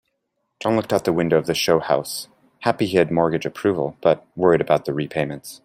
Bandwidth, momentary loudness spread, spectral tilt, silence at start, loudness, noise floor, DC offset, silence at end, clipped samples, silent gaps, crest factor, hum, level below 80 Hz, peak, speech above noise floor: 16 kHz; 8 LU; -5.5 dB/octave; 0.6 s; -21 LUFS; -74 dBFS; under 0.1%; 0.05 s; under 0.1%; none; 18 dB; none; -58 dBFS; -2 dBFS; 54 dB